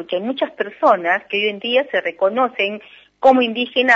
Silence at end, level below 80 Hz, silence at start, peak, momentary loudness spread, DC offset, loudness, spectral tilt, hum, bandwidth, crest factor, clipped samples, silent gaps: 0 s; -66 dBFS; 0 s; -2 dBFS; 8 LU; under 0.1%; -18 LUFS; -4.5 dB/octave; none; 7.6 kHz; 16 dB; under 0.1%; none